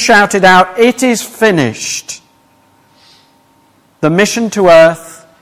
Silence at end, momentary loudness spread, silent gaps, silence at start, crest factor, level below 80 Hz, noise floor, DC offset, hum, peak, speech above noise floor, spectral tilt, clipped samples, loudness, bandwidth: 0.3 s; 13 LU; none; 0 s; 12 dB; -50 dBFS; -50 dBFS; under 0.1%; none; 0 dBFS; 41 dB; -4 dB/octave; under 0.1%; -9 LUFS; 16 kHz